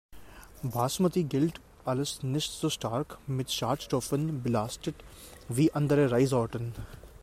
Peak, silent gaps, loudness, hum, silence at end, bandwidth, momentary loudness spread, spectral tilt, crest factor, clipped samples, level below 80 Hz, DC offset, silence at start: -14 dBFS; none; -30 LUFS; none; 0 s; 16 kHz; 14 LU; -5.5 dB/octave; 16 dB; under 0.1%; -54 dBFS; under 0.1%; 0.1 s